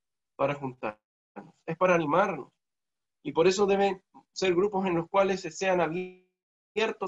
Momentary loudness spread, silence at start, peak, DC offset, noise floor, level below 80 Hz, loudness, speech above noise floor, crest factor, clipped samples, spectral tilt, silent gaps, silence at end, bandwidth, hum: 15 LU; 0.4 s; -10 dBFS; under 0.1%; under -90 dBFS; -66 dBFS; -28 LUFS; over 63 dB; 18 dB; under 0.1%; -5 dB/octave; 1.04-1.35 s, 6.43-6.75 s; 0 s; 8 kHz; none